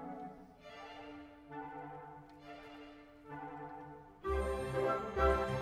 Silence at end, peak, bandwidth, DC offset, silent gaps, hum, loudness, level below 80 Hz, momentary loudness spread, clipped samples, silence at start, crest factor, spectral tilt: 0 s; -18 dBFS; 15 kHz; under 0.1%; none; none; -39 LUFS; -48 dBFS; 21 LU; under 0.1%; 0 s; 22 dB; -6.5 dB/octave